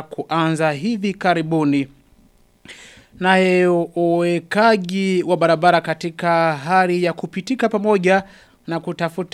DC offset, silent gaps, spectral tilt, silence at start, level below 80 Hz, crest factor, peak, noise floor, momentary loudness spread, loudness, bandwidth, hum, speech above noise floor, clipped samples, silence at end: under 0.1%; none; -6 dB/octave; 0 s; -60 dBFS; 18 dB; 0 dBFS; -54 dBFS; 9 LU; -18 LUFS; 13 kHz; none; 36 dB; under 0.1%; 0.05 s